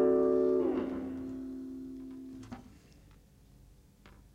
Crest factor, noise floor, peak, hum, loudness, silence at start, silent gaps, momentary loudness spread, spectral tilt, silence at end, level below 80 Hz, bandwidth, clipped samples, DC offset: 16 dB; -59 dBFS; -18 dBFS; none; -33 LUFS; 0 s; none; 20 LU; -8.5 dB/octave; 0.25 s; -60 dBFS; 7.8 kHz; under 0.1%; under 0.1%